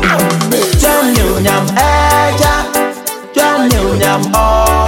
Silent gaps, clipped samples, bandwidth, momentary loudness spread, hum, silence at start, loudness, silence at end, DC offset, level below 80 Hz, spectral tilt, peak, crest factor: none; under 0.1%; 17.5 kHz; 5 LU; none; 0 s; -11 LUFS; 0 s; under 0.1%; -20 dBFS; -4.5 dB/octave; 0 dBFS; 10 dB